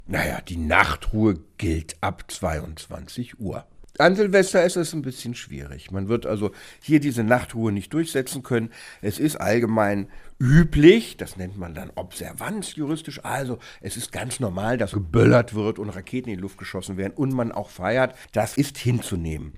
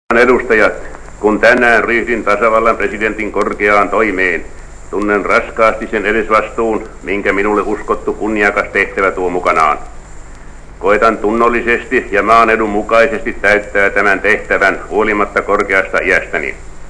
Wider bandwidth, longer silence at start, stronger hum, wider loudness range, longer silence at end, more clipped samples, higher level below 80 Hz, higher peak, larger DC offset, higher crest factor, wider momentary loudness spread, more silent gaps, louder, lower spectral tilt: first, 15.5 kHz vs 11 kHz; about the same, 0 s vs 0.1 s; neither; first, 6 LU vs 3 LU; about the same, 0 s vs 0 s; second, under 0.1% vs 0.6%; second, -40 dBFS vs -32 dBFS; about the same, 0 dBFS vs 0 dBFS; neither; first, 22 dB vs 12 dB; first, 16 LU vs 8 LU; neither; second, -23 LUFS vs -12 LUFS; about the same, -6 dB/octave vs -5 dB/octave